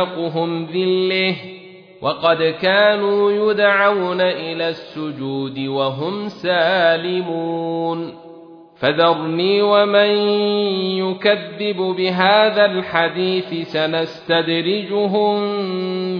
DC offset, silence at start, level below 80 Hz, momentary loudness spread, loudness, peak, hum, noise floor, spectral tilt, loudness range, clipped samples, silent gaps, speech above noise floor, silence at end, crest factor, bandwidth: under 0.1%; 0 s; -66 dBFS; 10 LU; -18 LUFS; -2 dBFS; none; -41 dBFS; -7.5 dB/octave; 3 LU; under 0.1%; none; 23 dB; 0 s; 16 dB; 5.4 kHz